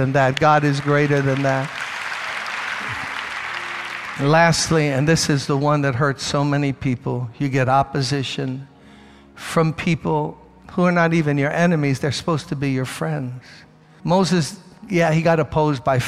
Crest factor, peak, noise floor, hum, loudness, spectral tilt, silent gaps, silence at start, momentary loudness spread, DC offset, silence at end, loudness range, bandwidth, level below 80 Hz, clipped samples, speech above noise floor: 16 dB; -4 dBFS; -45 dBFS; none; -20 LUFS; -5.5 dB/octave; none; 0 s; 10 LU; under 0.1%; 0 s; 4 LU; 13.5 kHz; -50 dBFS; under 0.1%; 27 dB